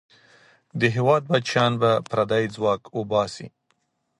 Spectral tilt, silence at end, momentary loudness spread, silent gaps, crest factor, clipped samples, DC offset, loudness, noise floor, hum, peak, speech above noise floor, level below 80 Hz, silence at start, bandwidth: -6 dB/octave; 0.7 s; 11 LU; none; 18 dB; under 0.1%; under 0.1%; -22 LUFS; -71 dBFS; none; -6 dBFS; 49 dB; -60 dBFS; 0.75 s; 11.5 kHz